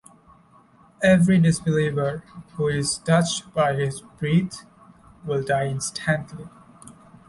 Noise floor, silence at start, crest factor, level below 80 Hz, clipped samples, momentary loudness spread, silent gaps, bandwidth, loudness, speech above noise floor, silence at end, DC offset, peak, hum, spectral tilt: -54 dBFS; 1 s; 18 dB; -54 dBFS; under 0.1%; 18 LU; none; 11.5 kHz; -22 LUFS; 32 dB; 0.35 s; under 0.1%; -6 dBFS; none; -5.5 dB/octave